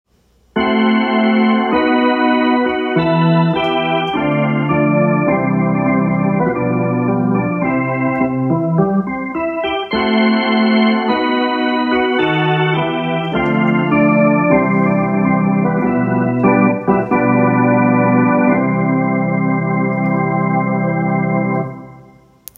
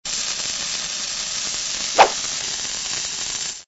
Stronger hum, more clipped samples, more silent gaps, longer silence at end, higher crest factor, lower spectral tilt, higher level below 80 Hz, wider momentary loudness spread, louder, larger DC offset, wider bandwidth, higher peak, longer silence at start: neither; neither; neither; first, 0.55 s vs 0.05 s; second, 14 dB vs 24 dB; first, -8.5 dB/octave vs 0.5 dB/octave; about the same, -48 dBFS vs -52 dBFS; second, 4 LU vs 8 LU; first, -15 LUFS vs -21 LUFS; neither; first, 15 kHz vs 8.2 kHz; about the same, 0 dBFS vs 0 dBFS; first, 0.55 s vs 0.05 s